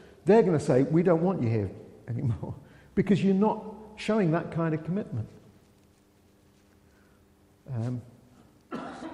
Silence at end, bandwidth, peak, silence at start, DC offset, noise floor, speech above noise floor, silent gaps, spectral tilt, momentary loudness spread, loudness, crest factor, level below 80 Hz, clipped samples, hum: 0 s; 11 kHz; -10 dBFS; 0.25 s; under 0.1%; -61 dBFS; 36 dB; none; -8.5 dB/octave; 17 LU; -27 LUFS; 18 dB; -60 dBFS; under 0.1%; none